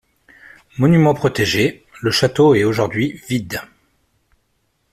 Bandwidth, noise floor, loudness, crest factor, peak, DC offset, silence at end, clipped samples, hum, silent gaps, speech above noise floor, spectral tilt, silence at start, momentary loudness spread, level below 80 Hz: 14.5 kHz; -66 dBFS; -16 LUFS; 16 dB; -2 dBFS; under 0.1%; 1.3 s; under 0.1%; none; none; 50 dB; -6 dB/octave; 0.75 s; 11 LU; -50 dBFS